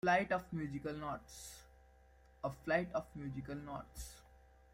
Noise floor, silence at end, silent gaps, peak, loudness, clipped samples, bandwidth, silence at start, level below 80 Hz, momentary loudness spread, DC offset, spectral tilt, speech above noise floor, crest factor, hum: -65 dBFS; 0.4 s; none; -20 dBFS; -41 LUFS; under 0.1%; 16.5 kHz; 0.05 s; -60 dBFS; 16 LU; under 0.1%; -5.5 dB/octave; 25 dB; 22 dB; none